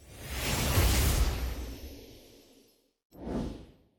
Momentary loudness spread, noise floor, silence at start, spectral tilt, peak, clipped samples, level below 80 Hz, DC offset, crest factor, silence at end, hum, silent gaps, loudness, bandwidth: 22 LU; -65 dBFS; 0 s; -4 dB/octave; -14 dBFS; under 0.1%; -36 dBFS; under 0.1%; 18 dB; 0.35 s; none; 3.05-3.10 s; -31 LUFS; 17.5 kHz